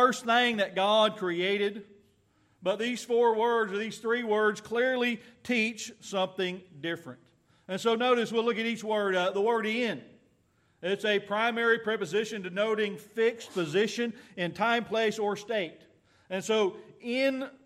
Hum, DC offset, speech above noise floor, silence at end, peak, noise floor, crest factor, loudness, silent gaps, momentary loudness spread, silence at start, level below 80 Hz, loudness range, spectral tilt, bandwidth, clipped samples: none; under 0.1%; 40 dB; 0.15 s; -10 dBFS; -68 dBFS; 20 dB; -29 LUFS; none; 11 LU; 0 s; -80 dBFS; 3 LU; -4 dB/octave; 14 kHz; under 0.1%